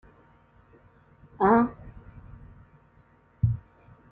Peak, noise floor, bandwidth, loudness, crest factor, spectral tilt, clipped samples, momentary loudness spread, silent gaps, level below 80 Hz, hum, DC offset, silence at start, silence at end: -8 dBFS; -60 dBFS; 4.1 kHz; -25 LUFS; 22 dB; -12 dB/octave; under 0.1%; 28 LU; none; -52 dBFS; none; under 0.1%; 1.4 s; 0.5 s